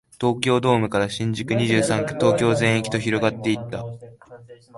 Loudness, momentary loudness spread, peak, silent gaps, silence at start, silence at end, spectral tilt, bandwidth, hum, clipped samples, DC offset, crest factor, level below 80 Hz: -21 LUFS; 9 LU; -4 dBFS; none; 0.2 s; 0 s; -5.5 dB/octave; 11.5 kHz; none; under 0.1%; under 0.1%; 18 dB; -52 dBFS